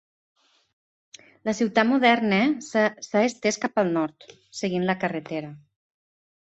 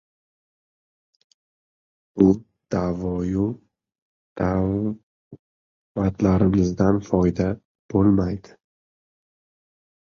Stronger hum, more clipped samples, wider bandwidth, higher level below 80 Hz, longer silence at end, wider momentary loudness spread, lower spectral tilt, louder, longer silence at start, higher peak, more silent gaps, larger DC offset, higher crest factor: neither; neither; first, 8.2 kHz vs 7 kHz; second, -68 dBFS vs -42 dBFS; second, 1 s vs 1.7 s; about the same, 13 LU vs 13 LU; second, -5 dB/octave vs -9 dB/octave; about the same, -24 LUFS vs -22 LUFS; second, 1.45 s vs 2.15 s; about the same, -4 dBFS vs -4 dBFS; second, none vs 3.98-4.36 s, 5.03-5.31 s, 5.39-5.95 s, 7.65-7.89 s; neither; about the same, 20 dB vs 20 dB